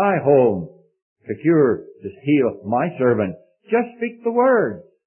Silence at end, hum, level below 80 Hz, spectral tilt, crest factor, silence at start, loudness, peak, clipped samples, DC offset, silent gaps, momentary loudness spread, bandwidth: 0.25 s; none; -64 dBFS; -12.5 dB/octave; 16 dB; 0 s; -19 LUFS; -4 dBFS; under 0.1%; under 0.1%; 1.02-1.16 s; 13 LU; 3.2 kHz